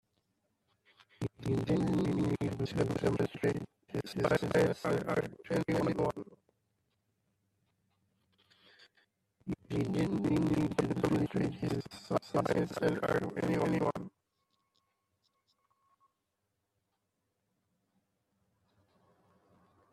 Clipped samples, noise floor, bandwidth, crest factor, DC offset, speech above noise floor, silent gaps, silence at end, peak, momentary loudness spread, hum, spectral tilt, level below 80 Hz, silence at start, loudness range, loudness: under 0.1%; -84 dBFS; 14 kHz; 22 dB; under 0.1%; 52 dB; none; 5.85 s; -14 dBFS; 11 LU; none; -7 dB/octave; -62 dBFS; 1.2 s; 7 LU; -33 LUFS